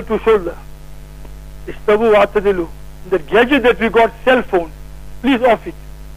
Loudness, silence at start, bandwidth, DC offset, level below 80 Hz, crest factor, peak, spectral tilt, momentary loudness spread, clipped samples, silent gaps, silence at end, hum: -14 LUFS; 0 s; 15.5 kHz; under 0.1%; -34 dBFS; 14 dB; 0 dBFS; -6 dB/octave; 17 LU; under 0.1%; none; 0 s; 50 Hz at -35 dBFS